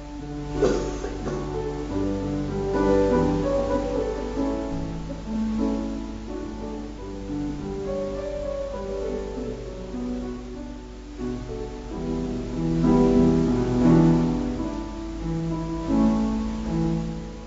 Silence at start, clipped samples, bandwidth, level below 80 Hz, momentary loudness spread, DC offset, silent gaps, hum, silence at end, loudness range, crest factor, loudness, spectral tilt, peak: 0 s; under 0.1%; 7.8 kHz; -36 dBFS; 14 LU; under 0.1%; none; none; 0 s; 10 LU; 18 dB; -26 LUFS; -7.5 dB/octave; -6 dBFS